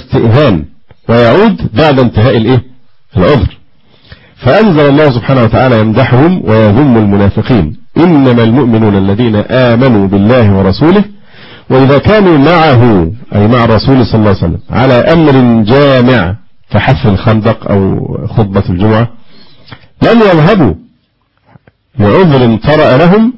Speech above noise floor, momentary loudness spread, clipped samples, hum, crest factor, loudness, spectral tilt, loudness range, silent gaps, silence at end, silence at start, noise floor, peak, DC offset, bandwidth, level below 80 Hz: 49 dB; 7 LU; 0.9%; none; 6 dB; -7 LUFS; -9.5 dB/octave; 3 LU; none; 0 s; 0.1 s; -55 dBFS; 0 dBFS; under 0.1%; 5.8 kHz; -26 dBFS